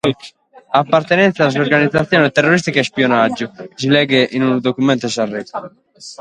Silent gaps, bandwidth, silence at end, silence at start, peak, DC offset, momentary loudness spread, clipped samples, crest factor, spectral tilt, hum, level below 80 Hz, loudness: none; 11 kHz; 0.05 s; 0.05 s; 0 dBFS; under 0.1%; 13 LU; under 0.1%; 16 dB; -5.5 dB/octave; none; -54 dBFS; -15 LUFS